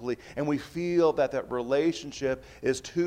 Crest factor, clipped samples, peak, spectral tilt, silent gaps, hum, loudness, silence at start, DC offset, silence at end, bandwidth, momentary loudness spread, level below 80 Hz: 16 dB; under 0.1%; -12 dBFS; -5.5 dB/octave; none; none; -29 LUFS; 0 s; under 0.1%; 0 s; 13.5 kHz; 7 LU; -58 dBFS